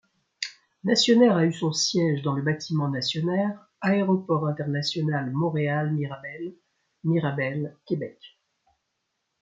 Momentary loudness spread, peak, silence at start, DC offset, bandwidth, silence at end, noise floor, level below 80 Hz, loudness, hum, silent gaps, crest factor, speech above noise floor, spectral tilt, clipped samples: 15 LU; -8 dBFS; 0.4 s; under 0.1%; 9.2 kHz; 1.15 s; -78 dBFS; -70 dBFS; -25 LUFS; none; none; 18 dB; 54 dB; -5.5 dB/octave; under 0.1%